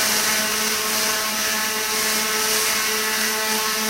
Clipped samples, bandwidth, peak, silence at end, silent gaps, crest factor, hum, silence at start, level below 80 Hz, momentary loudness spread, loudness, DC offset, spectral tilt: under 0.1%; 16 kHz; -6 dBFS; 0 s; none; 16 dB; none; 0 s; -56 dBFS; 2 LU; -19 LUFS; under 0.1%; 0.5 dB/octave